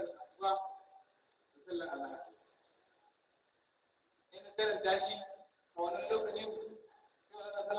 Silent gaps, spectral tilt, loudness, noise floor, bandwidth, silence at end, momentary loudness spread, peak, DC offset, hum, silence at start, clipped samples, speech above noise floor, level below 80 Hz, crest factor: none; -0.5 dB/octave; -39 LUFS; -77 dBFS; 4 kHz; 0 s; 22 LU; -22 dBFS; under 0.1%; none; 0 s; under 0.1%; 40 dB; -80 dBFS; 20 dB